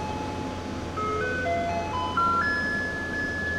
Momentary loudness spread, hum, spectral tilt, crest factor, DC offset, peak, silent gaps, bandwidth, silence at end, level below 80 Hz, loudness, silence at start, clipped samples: 9 LU; none; -5 dB/octave; 14 dB; under 0.1%; -14 dBFS; none; 15 kHz; 0 s; -48 dBFS; -27 LUFS; 0 s; under 0.1%